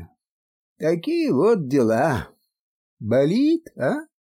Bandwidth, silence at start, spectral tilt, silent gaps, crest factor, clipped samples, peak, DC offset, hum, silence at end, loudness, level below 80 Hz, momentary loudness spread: 16 kHz; 0 s; -7 dB/octave; 0.29-0.76 s, 2.60-2.97 s; 14 dB; under 0.1%; -8 dBFS; under 0.1%; none; 0.15 s; -21 LUFS; -54 dBFS; 8 LU